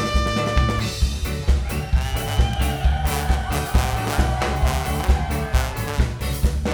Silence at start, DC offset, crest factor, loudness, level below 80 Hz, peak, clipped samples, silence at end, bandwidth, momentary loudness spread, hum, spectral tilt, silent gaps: 0 s; under 0.1%; 16 dB; -22 LUFS; -22 dBFS; -4 dBFS; under 0.1%; 0 s; over 20 kHz; 3 LU; none; -5 dB/octave; none